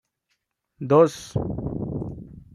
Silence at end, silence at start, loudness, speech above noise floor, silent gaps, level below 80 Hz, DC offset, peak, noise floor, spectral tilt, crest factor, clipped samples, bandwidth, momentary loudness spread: 0.15 s; 0.8 s; -23 LUFS; 54 dB; none; -46 dBFS; under 0.1%; -4 dBFS; -76 dBFS; -7.5 dB/octave; 20 dB; under 0.1%; 12.5 kHz; 18 LU